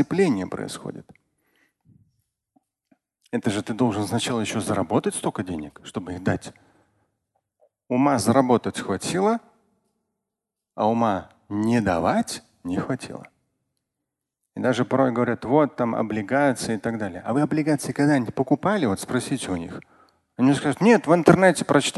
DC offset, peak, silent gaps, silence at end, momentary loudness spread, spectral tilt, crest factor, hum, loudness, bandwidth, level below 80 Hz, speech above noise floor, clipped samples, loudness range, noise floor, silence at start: under 0.1%; 0 dBFS; none; 0 s; 14 LU; -5.5 dB/octave; 24 dB; none; -23 LUFS; 12.5 kHz; -54 dBFS; 63 dB; under 0.1%; 6 LU; -85 dBFS; 0 s